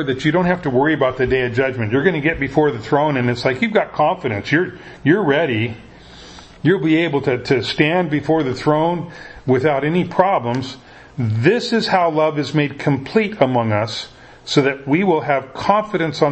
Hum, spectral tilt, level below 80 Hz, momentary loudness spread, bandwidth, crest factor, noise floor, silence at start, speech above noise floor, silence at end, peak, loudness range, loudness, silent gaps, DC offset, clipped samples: none; -6.5 dB/octave; -46 dBFS; 8 LU; 8.6 kHz; 18 dB; -40 dBFS; 0 s; 23 dB; 0 s; 0 dBFS; 1 LU; -18 LUFS; none; under 0.1%; under 0.1%